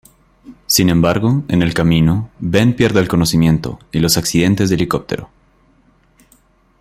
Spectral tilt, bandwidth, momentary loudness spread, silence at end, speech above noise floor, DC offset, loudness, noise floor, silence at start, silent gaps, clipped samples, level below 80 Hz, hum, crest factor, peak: -5 dB/octave; 16 kHz; 7 LU; 1.55 s; 39 dB; under 0.1%; -15 LUFS; -53 dBFS; 0.5 s; none; under 0.1%; -38 dBFS; none; 16 dB; 0 dBFS